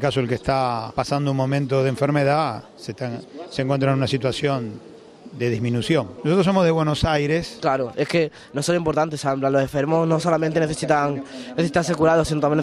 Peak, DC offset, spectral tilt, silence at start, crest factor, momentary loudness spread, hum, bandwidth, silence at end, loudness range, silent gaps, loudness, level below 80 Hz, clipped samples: -4 dBFS; under 0.1%; -6 dB/octave; 0 s; 16 dB; 11 LU; none; 13.5 kHz; 0 s; 3 LU; none; -21 LUFS; -46 dBFS; under 0.1%